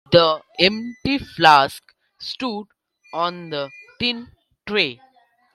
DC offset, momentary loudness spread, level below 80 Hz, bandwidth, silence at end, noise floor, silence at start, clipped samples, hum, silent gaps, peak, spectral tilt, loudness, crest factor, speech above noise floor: under 0.1%; 19 LU; -54 dBFS; 14.5 kHz; 0.6 s; -58 dBFS; 0.1 s; under 0.1%; none; none; 0 dBFS; -5 dB/octave; -19 LUFS; 22 dB; 38 dB